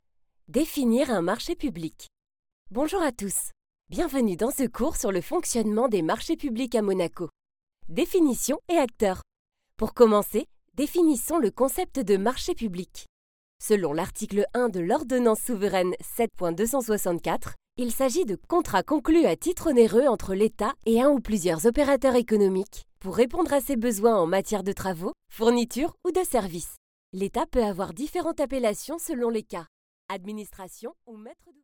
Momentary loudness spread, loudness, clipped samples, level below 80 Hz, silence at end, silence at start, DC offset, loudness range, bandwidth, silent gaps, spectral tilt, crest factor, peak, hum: 14 LU; -25 LUFS; under 0.1%; -48 dBFS; 0.3 s; 0.5 s; under 0.1%; 6 LU; 18 kHz; 2.39-2.43 s, 2.52-2.65 s, 7.63-7.67 s, 9.39-9.45 s, 13.09-13.59 s, 26.77-27.13 s, 29.68-30.09 s; -5 dB/octave; 20 dB; -4 dBFS; none